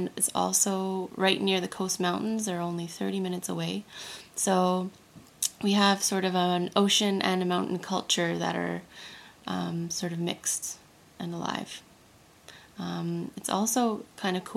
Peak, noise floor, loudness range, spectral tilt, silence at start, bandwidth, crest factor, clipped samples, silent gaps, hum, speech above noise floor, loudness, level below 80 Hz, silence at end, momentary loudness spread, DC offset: -6 dBFS; -57 dBFS; 8 LU; -3.5 dB/octave; 0 s; 16 kHz; 22 dB; under 0.1%; none; none; 28 dB; -28 LUFS; -70 dBFS; 0 s; 15 LU; under 0.1%